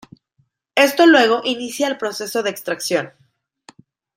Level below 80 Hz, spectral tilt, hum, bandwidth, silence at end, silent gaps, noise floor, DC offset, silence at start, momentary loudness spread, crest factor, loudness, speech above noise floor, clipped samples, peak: -70 dBFS; -3 dB/octave; none; 16 kHz; 1.1 s; none; -65 dBFS; under 0.1%; 0.75 s; 12 LU; 18 dB; -17 LUFS; 48 dB; under 0.1%; -2 dBFS